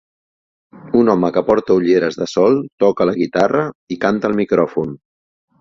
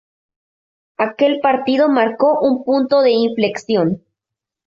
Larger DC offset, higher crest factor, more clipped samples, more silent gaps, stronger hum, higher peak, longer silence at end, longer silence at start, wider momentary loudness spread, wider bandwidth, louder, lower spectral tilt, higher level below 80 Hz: neither; about the same, 16 dB vs 14 dB; neither; first, 2.72-2.78 s, 3.75-3.87 s vs none; neither; about the same, -2 dBFS vs -2 dBFS; about the same, 0.65 s vs 0.7 s; second, 0.75 s vs 1 s; about the same, 6 LU vs 7 LU; about the same, 7.6 kHz vs 7.6 kHz; about the same, -16 LUFS vs -16 LUFS; about the same, -7 dB/octave vs -6.5 dB/octave; first, -52 dBFS vs -62 dBFS